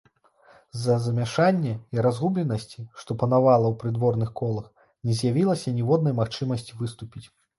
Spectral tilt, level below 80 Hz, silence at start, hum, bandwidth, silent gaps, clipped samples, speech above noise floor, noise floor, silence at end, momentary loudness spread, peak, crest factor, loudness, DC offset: -7.5 dB/octave; -58 dBFS; 0.75 s; none; 11.5 kHz; none; under 0.1%; 34 dB; -57 dBFS; 0.35 s; 13 LU; -8 dBFS; 18 dB; -25 LUFS; under 0.1%